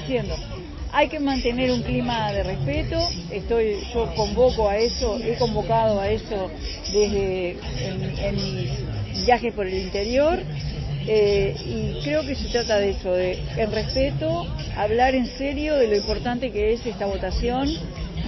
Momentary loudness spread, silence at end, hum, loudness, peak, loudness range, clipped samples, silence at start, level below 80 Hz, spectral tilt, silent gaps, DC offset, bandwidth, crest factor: 8 LU; 0 s; none; -24 LUFS; -6 dBFS; 2 LU; under 0.1%; 0 s; -34 dBFS; -5.5 dB/octave; none; under 0.1%; 6.2 kHz; 18 dB